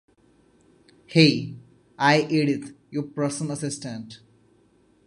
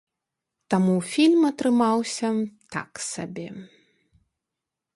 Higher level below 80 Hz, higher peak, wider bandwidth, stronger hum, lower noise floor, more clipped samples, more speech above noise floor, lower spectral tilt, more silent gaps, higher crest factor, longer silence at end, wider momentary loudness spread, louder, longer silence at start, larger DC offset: about the same, -66 dBFS vs -68 dBFS; first, -2 dBFS vs -8 dBFS; about the same, 11.5 kHz vs 11.5 kHz; neither; second, -61 dBFS vs -86 dBFS; neither; second, 38 dB vs 63 dB; about the same, -5 dB/octave vs -5.5 dB/octave; neither; first, 24 dB vs 18 dB; second, 0.9 s vs 1.3 s; about the same, 17 LU vs 15 LU; about the same, -23 LUFS vs -23 LUFS; first, 1.1 s vs 0.7 s; neither